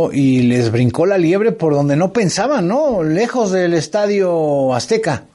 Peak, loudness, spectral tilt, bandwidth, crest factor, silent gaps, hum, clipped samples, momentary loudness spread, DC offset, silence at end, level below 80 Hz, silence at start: -4 dBFS; -15 LUFS; -6 dB/octave; 11.5 kHz; 12 dB; none; none; under 0.1%; 3 LU; under 0.1%; 0.15 s; -52 dBFS; 0 s